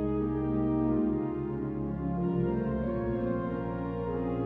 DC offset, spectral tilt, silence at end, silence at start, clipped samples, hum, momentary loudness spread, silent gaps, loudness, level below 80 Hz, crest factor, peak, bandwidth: under 0.1%; -11.5 dB/octave; 0 s; 0 s; under 0.1%; none; 6 LU; none; -31 LUFS; -44 dBFS; 12 dB; -18 dBFS; 4 kHz